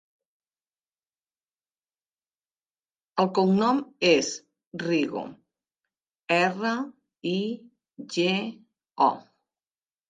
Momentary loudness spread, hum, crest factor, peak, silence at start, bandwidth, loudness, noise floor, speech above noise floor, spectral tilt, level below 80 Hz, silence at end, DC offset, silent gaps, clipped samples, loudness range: 18 LU; none; 22 dB; -8 dBFS; 3.15 s; 9.4 kHz; -26 LUFS; under -90 dBFS; over 65 dB; -4.5 dB/octave; -74 dBFS; 0.9 s; under 0.1%; 4.67-4.71 s; under 0.1%; 4 LU